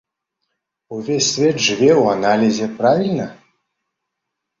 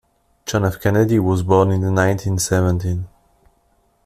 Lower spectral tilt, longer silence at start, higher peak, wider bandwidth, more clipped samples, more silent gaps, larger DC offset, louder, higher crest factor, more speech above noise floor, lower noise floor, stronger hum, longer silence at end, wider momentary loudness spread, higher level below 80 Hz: second, -4 dB/octave vs -6 dB/octave; first, 0.9 s vs 0.45 s; about the same, -2 dBFS vs -2 dBFS; second, 7.8 kHz vs 14 kHz; neither; neither; neither; about the same, -16 LUFS vs -18 LUFS; about the same, 16 dB vs 16 dB; first, 63 dB vs 44 dB; first, -79 dBFS vs -61 dBFS; neither; first, 1.25 s vs 1 s; first, 13 LU vs 10 LU; second, -58 dBFS vs -44 dBFS